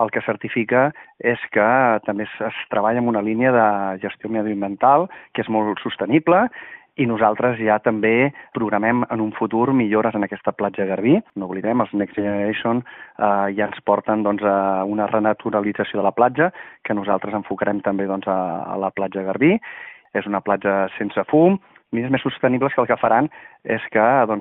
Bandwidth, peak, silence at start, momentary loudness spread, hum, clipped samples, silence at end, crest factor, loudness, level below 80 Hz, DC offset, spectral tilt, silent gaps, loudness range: 4 kHz; -2 dBFS; 0 s; 9 LU; none; under 0.1%; 0 s; 18 dB; -20 LUFS; -62 dBFS; under 0.1%; -5 dB/octave; none; 3 LU